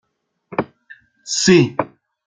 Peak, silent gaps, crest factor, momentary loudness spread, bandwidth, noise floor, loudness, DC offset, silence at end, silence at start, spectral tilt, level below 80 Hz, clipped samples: -2 dBFS; none; 18 dB; 19 LU; 9.6 kHz; -49 dBFS; -17 LUFS; under 0.1%; 0.4 s; 0.5 s; -4.5 dB/octave; -56 dBFS; under 0.1%